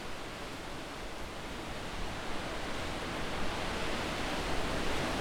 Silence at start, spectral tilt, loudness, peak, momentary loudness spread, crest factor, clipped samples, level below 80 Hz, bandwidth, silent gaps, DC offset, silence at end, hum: 0 s; -4 dB/octave; -38 LUFS; -20 dBFS; 7 LU; 16 dB; under 0.1%; -44 dBFS; 17 kHz; none; under 0.1%; 0 s; none